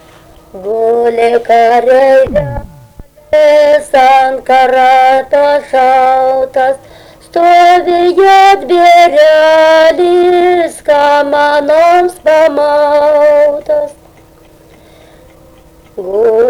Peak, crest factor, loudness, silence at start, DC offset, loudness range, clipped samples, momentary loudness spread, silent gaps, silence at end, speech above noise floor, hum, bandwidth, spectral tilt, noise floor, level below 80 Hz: 0 dBFS; 8 dB; -7 LUFS; 0.55 s; under 0.1%; 5 LU; under 0.1%; 8 LU; none; 0 s; 33 dB; none; 18 kHz; -4.5 dB/octave; -40 dBFS; -40 dBFS